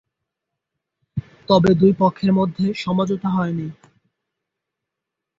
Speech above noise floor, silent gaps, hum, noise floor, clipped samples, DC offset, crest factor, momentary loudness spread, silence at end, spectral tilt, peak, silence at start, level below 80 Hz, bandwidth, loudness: 65 dB; none; none; -83 dBFS; under 0.1%; under 0.1%; 18 dB; 17 LU; 1.65 s; -8 dB/octave; -4 dBFS; 1.15 s; -52 dBFS; 7.6 kHz; -18 LUFS